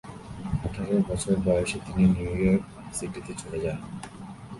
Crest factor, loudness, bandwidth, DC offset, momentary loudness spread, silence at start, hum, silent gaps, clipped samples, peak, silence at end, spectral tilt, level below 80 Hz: 16 dB; -27 LUFS; 11.5 kHz; under 0.1%; 16 LU; 0.05 s; none; none; under 0.1%; -10 dBFS; 0 s; -6.5 dB/octave; -42 dBFS